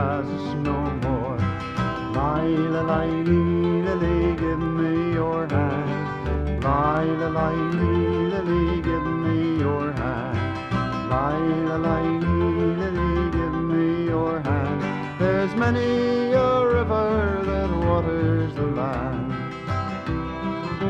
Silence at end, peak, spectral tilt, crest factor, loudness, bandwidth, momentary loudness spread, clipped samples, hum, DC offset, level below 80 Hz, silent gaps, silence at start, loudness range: 0 s; -8 dBFS; -8.5 dB/octave; 14 dB; -23 LUFS; 7.8 kHz; 6 LU; under 0.1%; none; under 0.1%; -36 dBFS; none; 0 s; 2 LU